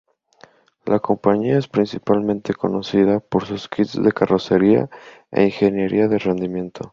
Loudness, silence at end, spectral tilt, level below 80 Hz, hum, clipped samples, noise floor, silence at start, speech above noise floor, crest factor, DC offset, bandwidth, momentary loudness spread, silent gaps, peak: -19 LUFS; 0.05 s; -8 dB/octave; -52 dBFS; none; under 0.1%; -51 dBFS; 0.85 s; 33 dB; 18 dB; under 0.1%; 7.4 kHz; 7 LU; none; -2 dBFS